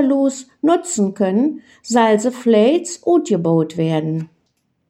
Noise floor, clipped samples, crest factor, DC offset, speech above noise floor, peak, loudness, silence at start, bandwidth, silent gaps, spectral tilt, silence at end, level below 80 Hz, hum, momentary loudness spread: -67 dBFS; under 0.1%; 14 dB; under 0.1%; 50 dB; -2 dBFS; -17 LUFS; 0 s; 13 kHz; none; -6 dB/octave; 0.65 s; -68 dBFS; none; 7 LU